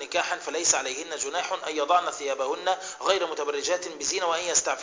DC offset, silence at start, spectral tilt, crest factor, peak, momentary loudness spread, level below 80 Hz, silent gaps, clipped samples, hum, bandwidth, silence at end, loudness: under 0.1%; 0 s; 0.5 dB/octave; 22 dB; -6 dBFS; 7 LU; -68 dBFS; none; under 0.1%; none; 7.8 kHz; 0 s; -26 LUFS